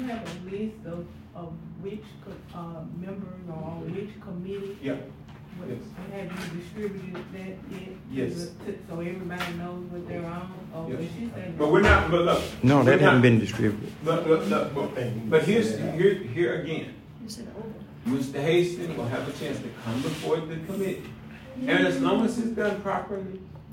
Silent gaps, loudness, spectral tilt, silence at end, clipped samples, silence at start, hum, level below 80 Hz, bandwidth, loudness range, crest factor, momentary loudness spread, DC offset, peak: none; -26 LUFS; -6.5 dB/octave; 0 s; under 0.1%; 0 s; none; -48 dBFS; 16 kHz; 15 LU; 22 dB; 19 LU; under 0.1%; -4 dBFS